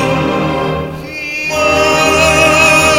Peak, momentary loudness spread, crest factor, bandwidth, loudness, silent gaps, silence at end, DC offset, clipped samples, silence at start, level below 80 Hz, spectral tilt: 0 dBFS; 13 LU; 12 dB; 17 kHz; -10 LUFS; none; 0 s; under 0.1%; 0.2%; 0 s; -34 dBFS; -3.5 dB/octave